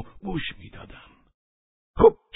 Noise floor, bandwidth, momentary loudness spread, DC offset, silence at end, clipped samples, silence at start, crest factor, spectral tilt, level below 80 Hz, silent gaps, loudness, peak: -49 dBFS; 4 kHz; 25 LU; under 0.1%; 0.2 s; under 0.1%; 0 s; 22 dB; -10.5 dB/octave; -44 dBFS; 1.34-1.94 s; -23 LUFS; -4 dBFS